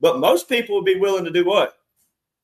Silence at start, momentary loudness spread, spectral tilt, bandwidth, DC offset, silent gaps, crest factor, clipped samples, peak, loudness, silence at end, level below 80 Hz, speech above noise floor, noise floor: 0 s; 3 LU; -4 dB/octave; 13.5 kHz; under 0.1%; none; 16 dB; under 0.1%; -2 dBFS; -19 LUFS; 0.75 s; -66 dBFS; 52 dB; -70 dBFS